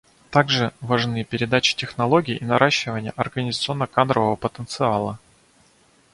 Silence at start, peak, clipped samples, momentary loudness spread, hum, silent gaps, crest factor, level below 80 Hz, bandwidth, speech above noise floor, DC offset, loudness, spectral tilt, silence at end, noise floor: 0.3 s; 0 dBFS; under 0.1%; 8 LU; none; none; 22 dB; -54 dBFS; 11.5 kHz; 36 dB; under 0.1%; -21 LUFS; -5 dB/octave; 0.95 s; -57 dBFS